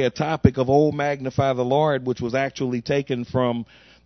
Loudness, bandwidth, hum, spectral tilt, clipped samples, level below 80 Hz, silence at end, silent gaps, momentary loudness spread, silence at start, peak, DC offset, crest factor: -22 LUFS; 6.4 kHz; none; -7 dB/octave; under 0.1%; -46 dBFS; 0.4 s; none; 6 LU; 0 s; 0 dBFS; under 0.1%; 22 dB